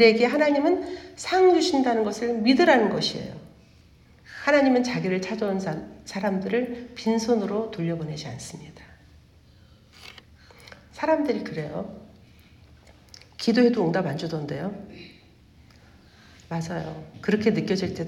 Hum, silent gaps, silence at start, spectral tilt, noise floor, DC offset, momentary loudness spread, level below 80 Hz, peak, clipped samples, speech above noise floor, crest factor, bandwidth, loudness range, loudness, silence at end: none; none; 0 s; -5.5 dB/octave; -54 dBFS; under 0.1%; 20 LU; -58 dBFS; -6 dBFS; under 0.1%; 30 dB; 20 dB; 13 kHz; 10 LU; -24 LUFS; 0 s